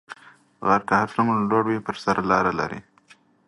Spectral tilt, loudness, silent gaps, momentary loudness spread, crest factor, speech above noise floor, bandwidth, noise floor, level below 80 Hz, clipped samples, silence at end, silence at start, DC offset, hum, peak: -6.5 dB/octave; -22 LUFS; none; 14 LU; 20 dB; 34 dB; 11.5 kHz; -56 dBFS; -56 dBFS; under 0.1%; 0.65 s; 0.1 s; under 0.1%; none; -4 dBFS